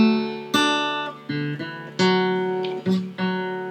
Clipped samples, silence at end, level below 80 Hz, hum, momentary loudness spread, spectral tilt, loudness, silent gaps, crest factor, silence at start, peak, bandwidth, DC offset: under 0.1%; 0 s; -82 dBFS; none; 9 LU; -5 dB/octave; -23 LUFS; none; 16 dB; 0 s; -6 dBFS; 15 kHz; under 0.1%